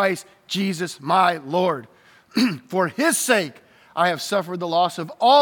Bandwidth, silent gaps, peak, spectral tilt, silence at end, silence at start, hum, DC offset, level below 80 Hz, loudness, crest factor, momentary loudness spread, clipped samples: 19.5 kHz; none; -4 dBFS; -3.5 dB/octave; 0 s; 0 s; none; under 0.1%; -78 dBFS; -22 LUFS; 18 dB; 10 LU; under 0.1%